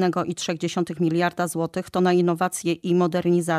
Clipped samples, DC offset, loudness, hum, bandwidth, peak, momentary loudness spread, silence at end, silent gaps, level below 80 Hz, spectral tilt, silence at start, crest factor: under 0.1%; under 0.1%; -23 LUFS; none; 15 kHz; -8 dBFS; 6 LU; 0 s; none; -64 dBFS; -5.5 dB/octave; 0 s; 14 dB